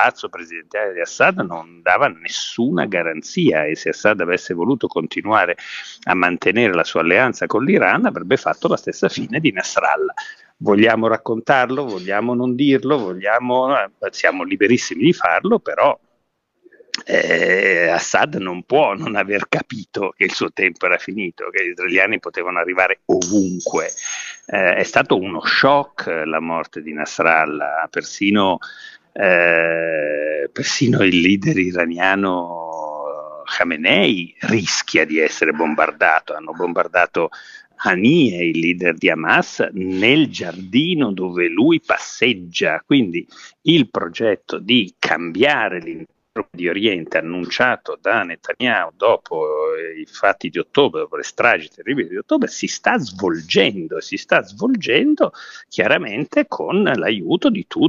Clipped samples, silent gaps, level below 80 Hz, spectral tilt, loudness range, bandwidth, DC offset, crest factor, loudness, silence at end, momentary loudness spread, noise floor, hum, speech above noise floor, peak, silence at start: under 0.1%; none; -62 dBFS; -4.5 dB/octave; 3 LU; 7.8 kHz; under 0.1%; 18 dB; -18 LUFS; 0 s; 11 LU; -69 dBFS; none; 51 dB; 0 dBFS; 0 s